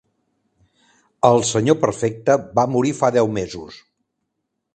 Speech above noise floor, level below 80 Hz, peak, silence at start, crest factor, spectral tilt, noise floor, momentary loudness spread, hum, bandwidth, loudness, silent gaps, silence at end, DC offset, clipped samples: 58 dB; -54 dBFS; 0 dBFS; 1.25 s; 20 dB; -5.5 dB/octave; -76 dBFS; 12 LU; none; 9 kHz; -18 LUFS; none; 1 s; under 0.1%; under 0.1%